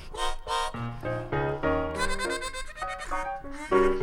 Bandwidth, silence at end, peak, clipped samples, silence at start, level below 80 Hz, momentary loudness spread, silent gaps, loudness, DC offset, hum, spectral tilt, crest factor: 18 kHz; 0 s; -8 dBFS; under 0.1%; 0 s; -38 dBFS; 9 LU; none; -30 LUFS; under 0.1%; none; -4.5 dB/octave; 20 dB